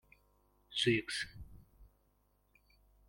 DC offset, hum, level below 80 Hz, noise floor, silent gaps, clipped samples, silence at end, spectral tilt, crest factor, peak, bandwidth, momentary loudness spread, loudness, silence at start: under 0.1%; 50 Hz at -65 dBFS; -64 dBFS; -74 dBFS; none; under 0.1%; 1.25 s; -4 dB/octave; 24 dB; -18 dBFS; 16.5 kHz; 24 LU; -36 LUFS; 0.7 s